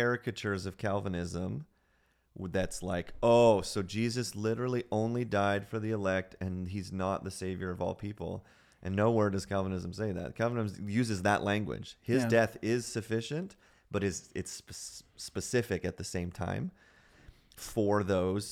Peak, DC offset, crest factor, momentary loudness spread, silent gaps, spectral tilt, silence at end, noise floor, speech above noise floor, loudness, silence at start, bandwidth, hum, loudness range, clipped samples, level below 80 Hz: -14 dBFS; under 0.1%; 20 dB; 12 LU; none; -5.5 dB/octave; 0 s; -71 dBFS; 39 dB; -33 LUFS; 0 s; 16 kHz; none; 7 LU; under 0.1%; -58 dBFS